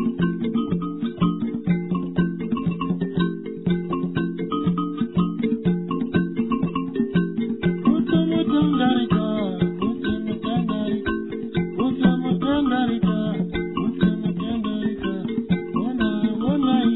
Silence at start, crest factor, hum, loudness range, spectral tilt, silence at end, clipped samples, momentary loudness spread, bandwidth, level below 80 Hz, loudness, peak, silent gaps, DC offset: 0 s; 16 dB; none; 3 LU; -11 dB/octave; 0 s; under 0.1%; 6 LU; 4.1 kHz; -46 dBFS; -23 LUFS; -6 dBFS; none; 0.3%